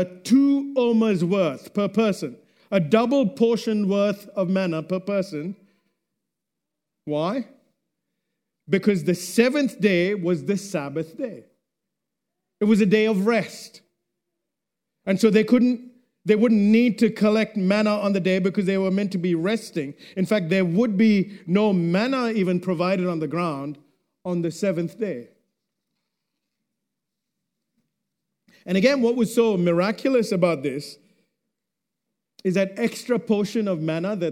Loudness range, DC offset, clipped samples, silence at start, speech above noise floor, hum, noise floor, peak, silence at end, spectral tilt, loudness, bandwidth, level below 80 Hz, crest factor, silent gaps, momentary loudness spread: 9 LU; under 0.1%; under 0.1%; 0 s; 63 dB; none; -84 dBFS; -4 dBFS; 0 s; -6.5 dB/octave; -22 LUFS; 15.5 kHz; -74 dBFS; 20 dB; none; 12 LU